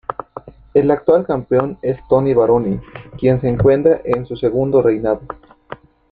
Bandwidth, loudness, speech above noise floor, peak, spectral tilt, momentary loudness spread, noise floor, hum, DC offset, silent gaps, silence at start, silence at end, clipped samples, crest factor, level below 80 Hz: 4.7 kHz; -16 LUFS; 22 dB; -2 dBFS; -11 dB/octave; 22 LU; -37 dBFS; none; under 0.1%; none; 0.1 s; 0.35 s; under 0.1%; 16 dB; -42 dBFS